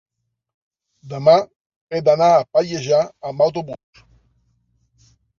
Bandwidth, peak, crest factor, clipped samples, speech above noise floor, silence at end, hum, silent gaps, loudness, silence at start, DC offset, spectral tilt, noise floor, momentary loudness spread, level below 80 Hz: 7.2 kHz; -2 dBFS; 18 dB; under 0.1%; 48 dB; 1.65 s; none; 1.56-1.70 s, 1.76-1.87 s; -17 LUFS; 1.05 s; under 0.1%; -5.5 dB/octave; -64 dBFS; 19 LU; -62 dBFS